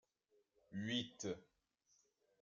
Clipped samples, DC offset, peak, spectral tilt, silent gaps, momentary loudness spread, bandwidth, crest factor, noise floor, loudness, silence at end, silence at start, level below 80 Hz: under 0.1%; under 0.1%; -28 dBFS; -4 dB/octave; none; 10 LU; 7.6 kHz; 22 dB; -81 dBFS; -46 LUFS; 1 s; 0.7 s; -84 dBFS